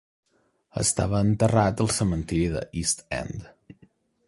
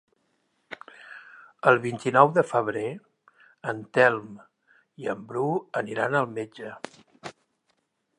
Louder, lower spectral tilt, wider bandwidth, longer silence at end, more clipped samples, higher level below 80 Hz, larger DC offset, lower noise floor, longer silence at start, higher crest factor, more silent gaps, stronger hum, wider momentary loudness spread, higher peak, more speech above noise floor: about the same, -25 LUFS vs -25 LUFS; about the same, -5 dB/octave vs -6 dB/octave; about the same, 11.5 kHz vs 11 kHz; about the same, 0.85 s vs 0.9 s; neither; first, -42 dBFS vs -76 dBFS; neither; second, -60 dBFS vs -74 dBFS; about the same, 0.75 s vs 0.7 s; second, 20 dB vs 26 dB; neither; neither; second, 11 LU vs 24 LU; second, -6 dBFS vs -2 dBFS; second, 36 dB vs 49 dB